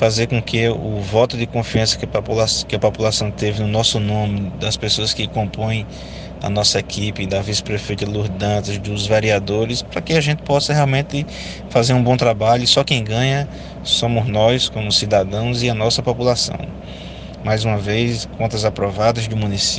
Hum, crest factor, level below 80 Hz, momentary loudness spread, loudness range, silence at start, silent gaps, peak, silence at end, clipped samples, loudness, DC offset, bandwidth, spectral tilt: none; 16 dB; -38 dBFS; 8 LU; 4 LU; 0 s; none; -2 dBFS; 0 s; under 0.1%; -18 LUFS; under 0.1%; 10 kHz; -4.5 dB/octave